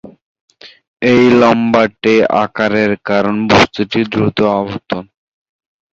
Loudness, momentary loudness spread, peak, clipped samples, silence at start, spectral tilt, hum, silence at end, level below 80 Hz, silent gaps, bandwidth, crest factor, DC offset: -12 LUFS; 9 LU; 0 dBFS; under 0.1%; 0.05 s; -6 dB/octave; none; 0.9 s; -44 dBFS; 0.22-0.35 s, 0.41-0.48 s, 0.87-0.96 s; 7.8 kHz; 14 dB; under 0.1%